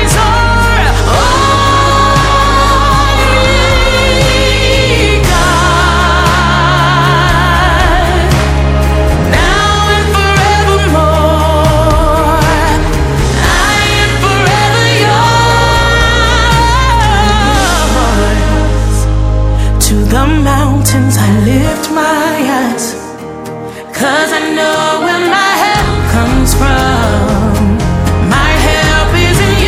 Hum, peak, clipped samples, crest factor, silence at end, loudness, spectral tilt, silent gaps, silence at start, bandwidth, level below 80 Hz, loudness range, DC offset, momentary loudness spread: none; 0 dBFS; 0.2%; 8 dB; 0 s; -9 LUFS; -4.5 dB/octave; none; 0 s; 16 kHz; -14 dBFS; 3 LU; under 0.1%; 4 LU